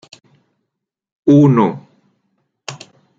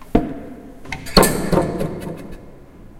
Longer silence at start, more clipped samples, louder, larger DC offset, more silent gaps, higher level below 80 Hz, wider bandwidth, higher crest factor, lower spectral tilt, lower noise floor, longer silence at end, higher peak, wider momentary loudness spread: first, 1.25 s vs 0 s; neither; first, -13 LUFS vs -19 LUFS; neither; neither; second, -60 dBFS vs -32 dBFS; second, 7.8 kHz vs 17 kHz; about the same, 16 dB vs 20 dB; first, -8 dB/octave vs -4.5 dB/octave; first, -78 dBFS vs -40 dBFS; first, 0.45 s vs 0 s; about the same, -2 dBFS vs 0 dBFS; about the same, 24 LU vs 23 LU